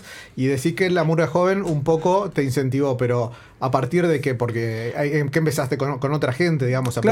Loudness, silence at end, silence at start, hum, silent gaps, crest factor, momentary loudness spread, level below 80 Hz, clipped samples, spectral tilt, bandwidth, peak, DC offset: -21 LUFS; 0 s; 0 s; none; none; 18 dB; 5 LU; -54 dBFS; under 0.1%; -6.5 dB/octave; 16.5 kHz; -4 dBFS; under 0.1%